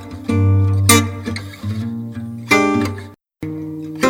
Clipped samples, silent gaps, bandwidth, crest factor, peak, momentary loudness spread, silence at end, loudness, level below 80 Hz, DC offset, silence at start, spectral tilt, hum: under 0.1%; none; 18 kHz; 18 dB; 0 dBFS; 16 LU; 0 s; -17 LUFS; -48 dBFS; under 0.1%; 0 s; -4.5 dB/octave; none